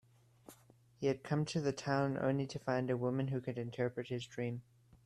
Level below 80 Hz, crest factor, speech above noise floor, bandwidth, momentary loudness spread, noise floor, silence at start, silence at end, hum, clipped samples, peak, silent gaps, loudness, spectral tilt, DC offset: -72 dBFS; 18 dB; 29 dB; 12.5 kHz; 7 LU; -65 dBFS; 0.5 s; 0.45 s; none; under 0.1%; -20 dBFS; none; -38 LUFS; -6.5 dB/octave; under 0.1%